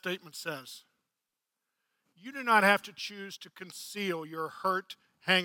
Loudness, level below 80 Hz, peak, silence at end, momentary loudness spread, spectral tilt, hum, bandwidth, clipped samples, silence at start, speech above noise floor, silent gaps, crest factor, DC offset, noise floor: -31 LUFS; -88 dBFS; -8 dBFS; 0 s; 21 LU; -3.5 dB/octave; none; 17.5 kHz; under 0.1%; 0.05 s; 55 dB; none; 26 dB; under 0.1%; -88 dBFS